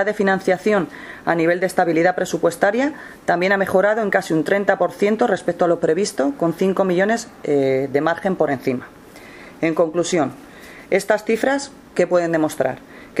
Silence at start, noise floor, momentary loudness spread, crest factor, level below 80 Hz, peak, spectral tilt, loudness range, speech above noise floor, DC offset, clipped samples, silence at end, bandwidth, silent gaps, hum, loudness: 0 s; -40 dBFS; 8 LU; 18 dB; -58 dBFS; -2 dBFS; -5.5 dB/octave; 3 LU; 22 dB; under 0.1%; under 0.1%; 0 s; 15.5 kHz; none; none; -19 LUFS